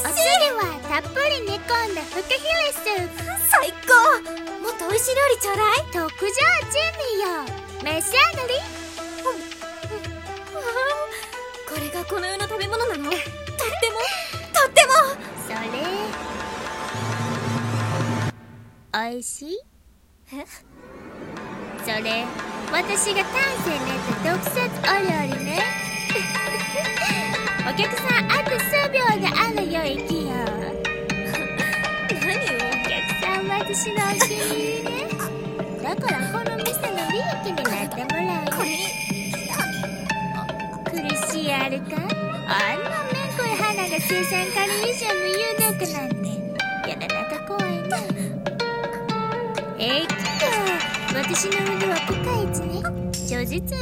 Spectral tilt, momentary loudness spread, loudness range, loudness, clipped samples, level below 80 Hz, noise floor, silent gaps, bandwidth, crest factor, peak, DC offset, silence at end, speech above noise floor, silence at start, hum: -3 dB/octave; 11 LU; 7 LU; -22 LUFS; under 0.1%; -48 dBFS; -54 dBFS; none; 16.5 kHz; 24 dB; 0 dBFS; under 0.1%; 0 s; 31 dB; 0 s; none